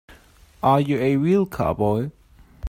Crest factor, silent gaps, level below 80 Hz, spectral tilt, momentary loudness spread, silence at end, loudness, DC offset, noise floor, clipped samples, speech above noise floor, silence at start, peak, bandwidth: 18 dB; none; -42 dBFS; -8.5 dB/octave; 9 LU; 0.05 s; -21 LUFS; under 0.1%; -51 dBFS; under 0.1%; 31 dB; 0.1 s; -4 dBFS; 16.5 kHz